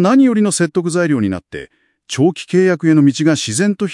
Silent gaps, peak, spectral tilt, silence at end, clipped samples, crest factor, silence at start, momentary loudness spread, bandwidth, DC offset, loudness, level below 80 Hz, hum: none; 0 dBFS; -5.5 dB/octave; 0 s; under 0.1%; 14 dB; 0 s; 12 LU; 12 kHz; under 0.1%; -14 LUFS; -58 dBFS; none